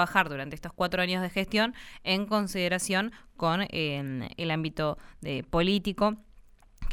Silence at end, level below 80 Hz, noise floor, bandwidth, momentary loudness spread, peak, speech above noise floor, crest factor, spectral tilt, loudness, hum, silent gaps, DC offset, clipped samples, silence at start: 0 s; -46 dBFS; -55 dBFS; 17.5 kHz; 10 LU; -6 dBFS; 25 dB; 22 dB; -4.5 dB/octave; -29 LUFS; none; none; under 0.1%; under 0.1%; 0 s